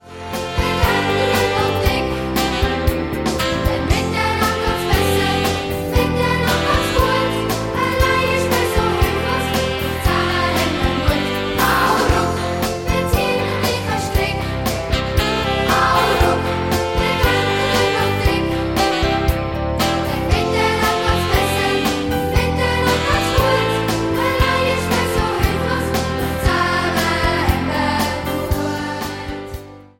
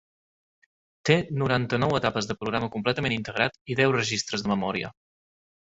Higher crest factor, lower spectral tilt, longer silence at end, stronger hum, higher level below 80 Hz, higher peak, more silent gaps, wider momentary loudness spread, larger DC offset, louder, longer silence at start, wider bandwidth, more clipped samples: second, 16 dB vs 22 dB; about the same, -5 dB/octave vs -5 dB/octave; second, 0.15 s vs 0.85 s; neither; first, -26 dBFS vs -56 dBFS; about the same, -2 dBFS vs -4 dBFS; second, none vs 3.61-3.65 s; about the same, 5 LU vs 6 LU; neither; first, -18 LUFS vs -26 LUFS; second, 0.05 s vs 1.05 s; first, 17 kHz vs 8 kHz; neither